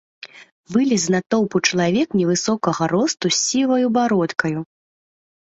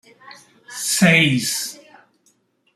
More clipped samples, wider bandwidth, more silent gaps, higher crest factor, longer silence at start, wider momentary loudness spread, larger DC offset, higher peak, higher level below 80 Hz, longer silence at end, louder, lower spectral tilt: neither; second, 8.2 kHz vs 15.5 kHz; first, 0.52-0.64 s, 1.26-1.30 s vs none; about the same, 18 dB vs 20 dB; about the same, 0.25 s vs 0.25 s; second, 10 LU vs 16 LU; neither; about the same, -2 dBFS vs -2 dBFS; about the same, -60 dBFS vs -60 dBFS; about the same, 0.95 s vs 1 s; second, -19 LUFS vs -16 LUFS; about the same, -4 dB/octave vs -3.5 dB/octave